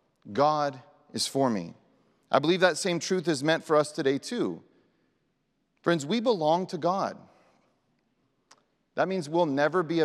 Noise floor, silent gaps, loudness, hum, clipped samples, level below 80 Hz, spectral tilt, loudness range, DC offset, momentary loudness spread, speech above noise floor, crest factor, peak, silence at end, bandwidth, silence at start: -75 dBFS; none; -27 LUFS; none; under 0.1%; -84 dBFS; -4.5 dB/octave; 4 LU; under 0.1%; 9 LU; 48 dB; 22 dB; -6 dBFS; 0 s; 14 kHz; 0.25 s